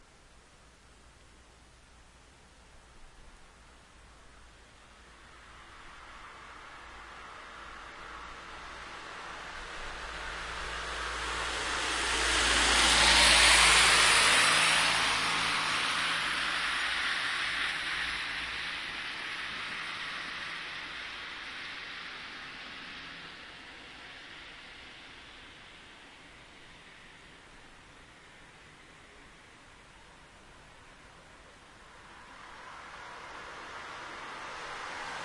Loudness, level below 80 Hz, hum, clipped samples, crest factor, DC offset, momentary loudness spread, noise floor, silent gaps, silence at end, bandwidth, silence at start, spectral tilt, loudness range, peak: -27 LUFS; -50 dBFS; none; under 0.1%; 24 dB; under 0.1%; 27 LU; -58 dBFS; none; 0 s; 11.5 kHz; 0 s; 0 dB/octave; 27 LU; -8 dBFS